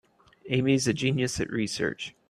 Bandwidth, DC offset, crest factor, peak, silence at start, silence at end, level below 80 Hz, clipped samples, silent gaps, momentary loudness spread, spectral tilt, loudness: 14 kHz; under 0.1%; 18 dB; -10 dBFS; 0.45 s; 0.2 s; -56 dBFS; under 0.1%; none; 6 LU; -5 dB/octave; -27 LUFS